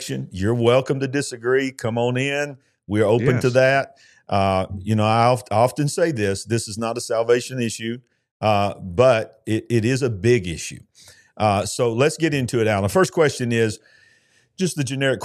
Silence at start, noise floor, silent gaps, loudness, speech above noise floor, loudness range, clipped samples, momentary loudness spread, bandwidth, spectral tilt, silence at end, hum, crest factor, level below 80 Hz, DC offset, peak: 0 s; -59 dBFS; 8.31-8.40 s; -21 LUFS; 39 dB; 2 LU; under 0.1%; 9 LU; 14 kHz; -5.5 dB/octave; 0 s; none; 18 dB; -54 dBFS; under 0.1%; -2 dBFS